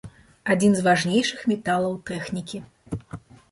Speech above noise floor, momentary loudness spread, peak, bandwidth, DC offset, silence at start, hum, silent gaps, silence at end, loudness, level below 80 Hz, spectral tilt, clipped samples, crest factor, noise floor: 20 dB; 17 LU; -6 dBFS; 11.5 kHz; under 0.1%; 0.05 s; none; none; 0.35 s; -23 LUFS; -54 dBFS; -5 dB/octave; under 0.1%; 18 dB; -42 dBFS